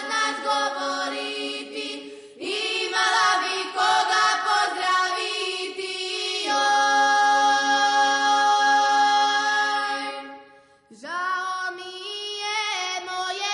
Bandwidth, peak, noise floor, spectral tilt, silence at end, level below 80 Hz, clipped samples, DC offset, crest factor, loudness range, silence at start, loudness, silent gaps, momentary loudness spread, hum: 11 kHz; -10 dBFS; -52 dBFS; 1 dB/octave; 0 s; -76 dBFS; under 0.1%; under 0.1%; 12 dB; 8 LU; 0 s; -22 LUFS; none; 13 LU; none